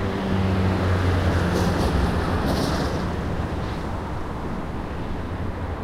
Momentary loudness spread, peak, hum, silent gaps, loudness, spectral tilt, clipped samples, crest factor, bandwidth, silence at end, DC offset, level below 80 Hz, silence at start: 9 LU; -8 dBFS; none; none; -24 LUFS; -6.5 dB/octave; under 0.1%; 16 dB; 15 kHz; 0 s; under 0.1%; -32 dBFS; 0 s